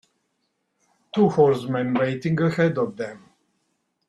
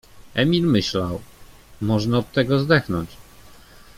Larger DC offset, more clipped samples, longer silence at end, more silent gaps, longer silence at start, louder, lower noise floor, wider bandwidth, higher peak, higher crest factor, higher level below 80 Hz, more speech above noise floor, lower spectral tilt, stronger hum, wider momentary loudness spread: neither; neither; first, 0.9 s vs 0.45 s; neither; first, 1.15 s vs 0.15 s; about the same, -22 LUFS vs -21 LUFS; first, -74 dBFS vs -46 dBFS; second, 11.5 kHz vs 16 kHz; about the same, -4 dBFS vs -2 dBFS; about the same, 20 dB vs 20 dB; second, -62 dBFS vs -46 dBFS; first, 53 dB vs 26 dB; first, -8 dB/octave vs -6.5 dB/octave; neither; about the same, 11 LU vs 11 LU